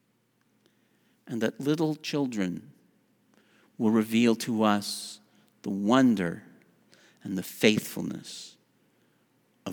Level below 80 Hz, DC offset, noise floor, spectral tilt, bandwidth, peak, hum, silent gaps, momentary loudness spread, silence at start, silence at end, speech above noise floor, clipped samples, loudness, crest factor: -76 dBFS; under 0.1%; -70 dBFS; -5 dB/octave; over 20 kHz; -6 dBFS; none; none; 18 LU; 1.25 s; 0 s; 44 dB; under 0.1%; -27 LUFS; 24 dB